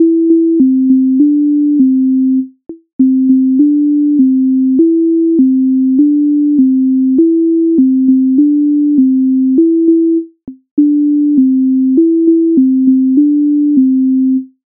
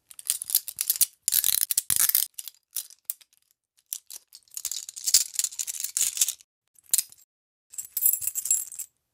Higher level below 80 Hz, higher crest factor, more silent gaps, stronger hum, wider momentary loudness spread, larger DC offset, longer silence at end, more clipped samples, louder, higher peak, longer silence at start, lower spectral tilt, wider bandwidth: first, -62 dBFS vs -72 dBFS; second, 8 dB vs 28 dB; second, 2.93-2.99 s, 10.71-10.77 s vs 6.44-6.62 s, 6.68-6.74 s, 7.24-7.70 s; neither; second, 2 LU vs 18 LU; neither; about the same, 0.2 s vs 0.3 s; neither; first, -10 LUFS vs -24 LUFS; about the same, 0 dBFS vs -2 dBFS; second, 0 s vs 0.25 s; first, -16 dB/octave vs 3.5 dB/octave; second, 0.6 kHz vs 17 kHz